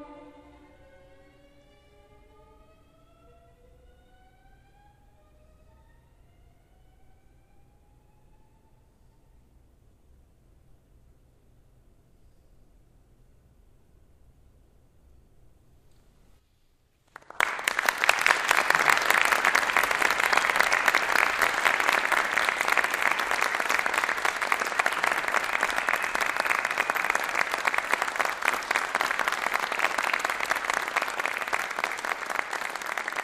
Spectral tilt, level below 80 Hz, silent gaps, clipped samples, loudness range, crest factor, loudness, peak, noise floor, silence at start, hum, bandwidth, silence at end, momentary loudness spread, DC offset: -0.5 dB/octave; -60 dBFS; none; under 0.1%; 6 LU; 30 dB; -25 LUFS; 0 dBFS; -65 dBFS; 0 s; none; 15.5 kHz; 0 s; 7 LU; under 0.1%